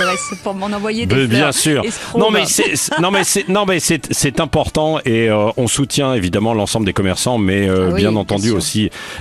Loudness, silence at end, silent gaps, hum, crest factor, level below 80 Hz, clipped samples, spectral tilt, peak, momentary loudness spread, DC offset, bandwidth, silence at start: -15 LUFS; 0 s; none; none; 14 dB; -40 dBFS; under 0.1%; -4 dB/octave; 0 dBFS; 6 LU; under 0.1%; 14 kHz; 0 s